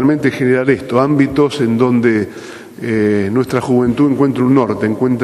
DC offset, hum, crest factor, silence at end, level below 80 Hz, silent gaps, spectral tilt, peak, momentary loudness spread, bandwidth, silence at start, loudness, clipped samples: under 0.1%; none; 14 dB; 0 s; -48 dBFS; none; -7.5 dB/octave; 0 dBFS; 6 LU; 12.5 kHz; 0 s; -14 LUFS; under 0.1%